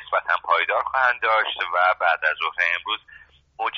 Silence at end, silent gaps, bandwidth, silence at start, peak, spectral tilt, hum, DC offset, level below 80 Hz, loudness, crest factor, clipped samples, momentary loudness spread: 0 s; none; 6.6 kHz; 0 s; -6 dBFS; 4 dB/octave; none; under 0.1%; -62 dBFS; -21 LUFS; 16 dB; under 0.1%; 6 LU